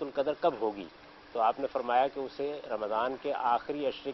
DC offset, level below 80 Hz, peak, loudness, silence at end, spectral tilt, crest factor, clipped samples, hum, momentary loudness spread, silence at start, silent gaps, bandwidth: under 0.1%; -68 dBFS; -14 dBFS; -32 LUFS; 0 s; -6.5 dB/octave; 18 dB; under 0.1%; none; 8 LU; 0 s; none; 6 kHz